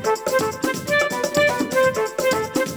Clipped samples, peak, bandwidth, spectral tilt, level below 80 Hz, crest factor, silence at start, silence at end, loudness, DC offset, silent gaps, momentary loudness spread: under 0.1%; -6 dBFS; over 20 kHz; -3.5 dB/octave; -56 dBFS; 14 dB; 0 s; 0 s; -20 LUFS; under 0.1%; none; 3 LU